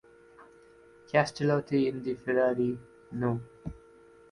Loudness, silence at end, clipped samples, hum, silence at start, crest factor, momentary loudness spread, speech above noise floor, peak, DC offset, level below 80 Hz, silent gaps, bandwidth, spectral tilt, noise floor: -29 LUFS; 0.55 s; under 0.1%; none; 0.4 s; 22 dB; 16 LU; 28 dB; -10 dBFS; under 0.1%; -60 dBFS; none; 11.5 kHz; -7 dB/octave; -56 dBFS